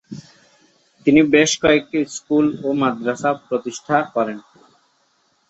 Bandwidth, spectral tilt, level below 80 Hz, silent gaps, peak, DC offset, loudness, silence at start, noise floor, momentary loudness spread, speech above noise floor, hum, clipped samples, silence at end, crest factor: 8.2 kHz; -4.5 dB/octave; -56 dBFS; none; 0 dBFS; under 0.1%; -18 LUFS; 0.1 s; -63 dBFS; 11 LU; 45 dB; none; under 0.1%; 1.1 s; 18 dB